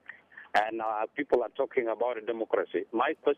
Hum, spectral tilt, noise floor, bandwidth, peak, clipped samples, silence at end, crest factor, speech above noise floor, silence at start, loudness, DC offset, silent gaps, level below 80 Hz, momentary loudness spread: none; -5 dB/octave; -50 dBFS; 9.8 kHz; -14 dBFS; under 0.1%; 0.05 s; 18 dB; 21 dB; 0.1 s; -30 LUFS; under 0.1%; none; -72 dBFS; 5 LU